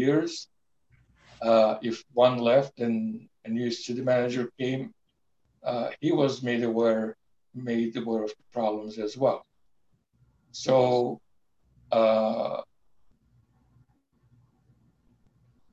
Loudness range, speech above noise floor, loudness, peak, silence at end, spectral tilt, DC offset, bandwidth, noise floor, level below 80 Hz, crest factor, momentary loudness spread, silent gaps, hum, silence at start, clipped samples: 5 LU; 50 dB; -27 LUFS; -8 dBFS; 3.1 s; -6 dB/octave; under 0.1%; 8 kHz; -75 dBFS; -70 dBFS; 20 dB; 14 LU; none; none; 0 s; under 0.1%